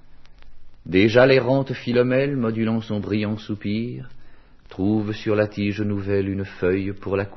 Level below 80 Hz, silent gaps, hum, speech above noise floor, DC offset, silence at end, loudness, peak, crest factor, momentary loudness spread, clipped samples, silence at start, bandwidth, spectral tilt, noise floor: -48 dBFS; none; none; 21 dB; under 0.1%; 0 s; -22 LUFS; 0 dBFS; 22 dB; 11 LU; under 0.1%; 0 s; 6.2 kHz; -8 dB/octave; -42 dBFS